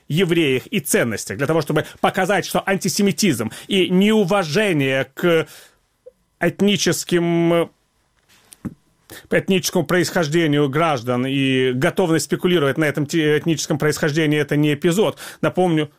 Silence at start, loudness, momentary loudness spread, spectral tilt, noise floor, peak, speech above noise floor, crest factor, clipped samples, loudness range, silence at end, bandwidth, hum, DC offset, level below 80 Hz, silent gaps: 0.1 s; -19 LUFS; 5 LU; -5 dB/octave; -63 dBFS; -4 dBFS; 45 dB; 16 dB; under 0.1%; 3 LU; 0.1 s; 16.5 kHz; none; 0.2%; -54 dBFS; none